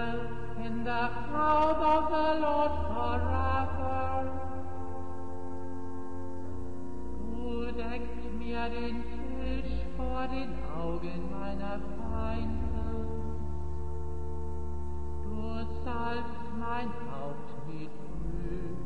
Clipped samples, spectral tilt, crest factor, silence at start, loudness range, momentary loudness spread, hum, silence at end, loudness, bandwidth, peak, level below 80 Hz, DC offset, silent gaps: under 0.1%; -8 dB/octave; 18 dB; 0 s; 10 LU; 14 LU; 50 Hz at -60 dBFS; 0 s; -35 LUFS; 9.6 kHz; -16 dBFS; -40 dBFS; 3%; none